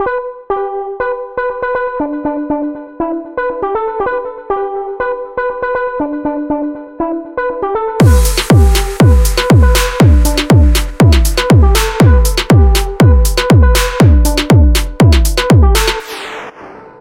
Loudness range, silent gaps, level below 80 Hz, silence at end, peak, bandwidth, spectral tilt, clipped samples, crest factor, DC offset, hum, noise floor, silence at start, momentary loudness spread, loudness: 9 LU; none; -14 dBFS; 0.15 s; 0 dBFS; 16.5 kHz; -5.5 dB/octave; under 0.1%; 10 dB; under 0.1%; none; -33 dBFS; 0 s; 11 LU; -12 LUFS